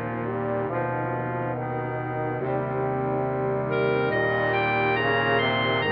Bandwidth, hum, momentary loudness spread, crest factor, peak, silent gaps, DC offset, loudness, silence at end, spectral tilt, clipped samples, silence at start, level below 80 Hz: 5.6 kHz; none; 7 LU; 14 dB; -10 dBFS; none; under 0.1%; -25 LUFS; 0 s; -9.5 dB/octave; under 0.1%; 0 s; -54 dBFS